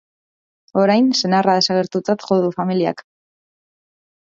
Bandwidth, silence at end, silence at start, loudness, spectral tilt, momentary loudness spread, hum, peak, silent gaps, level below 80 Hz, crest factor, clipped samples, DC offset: 7.6 kHz; 1.25 s; 0.75 s; -17 LUFS; -5 dB/octave; 8 LU; none; -2 dBFS; none; -66 dBFS; 18 dB; under 0.1%; under 0.1%